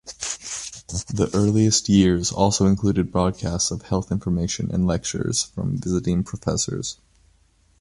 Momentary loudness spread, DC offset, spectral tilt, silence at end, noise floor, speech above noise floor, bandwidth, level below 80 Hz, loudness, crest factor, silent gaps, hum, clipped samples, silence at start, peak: 12 LU; under 0.1%; -5 dB/octave; 0.9 s; -59 dBFS; 38 dB; 11.5 kHz; -40 dBFS; -22 LUFS; 20 dB; none; none; under 0.1%; 0.05 s; -2 dBFS